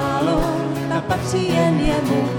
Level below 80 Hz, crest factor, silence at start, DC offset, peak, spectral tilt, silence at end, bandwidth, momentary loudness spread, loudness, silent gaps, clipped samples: -32 dBFS; 12 dB; 0 s; under 0.1%; -6 dBFS; -6 dB/octave; 0 s; 18 kHz; 5 LU; -20 LUFS; none; under 0.1%